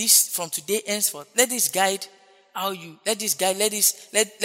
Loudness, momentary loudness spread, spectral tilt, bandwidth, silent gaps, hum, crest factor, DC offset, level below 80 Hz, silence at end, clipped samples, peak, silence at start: -22 LUFS; 11 LU; -0.5 dB/octave; 16.5 kHz; none; none; 24 dB; under 0.1%; -82 dBFS; 0 s; under 0.1%; 0 dBFS; 0 s